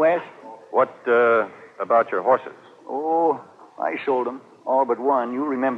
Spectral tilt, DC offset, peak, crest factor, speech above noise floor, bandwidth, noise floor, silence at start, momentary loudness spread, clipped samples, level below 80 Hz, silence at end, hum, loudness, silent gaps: -7 dB/octave; under 0.1%; -6 dBFS; 16 dB; 20 dB; 6.2 kHz; -41 dBFS; 0 s; 13 LU; under 0.1%; -82 dBFS; 0 s; none; -22 LUFS; none